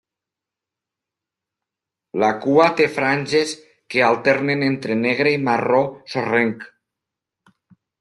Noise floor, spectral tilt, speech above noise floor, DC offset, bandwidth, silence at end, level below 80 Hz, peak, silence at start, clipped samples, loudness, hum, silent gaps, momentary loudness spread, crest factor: -86 dBFS; -5.5 dB/octave; 68 dB; under 0.1%; 12 kHz; 1.35 s; -64 dBFS; -2 dBFS; 2.15 s; under 0.1%; -19 LUFS; none; none; 9 LU; 18 dB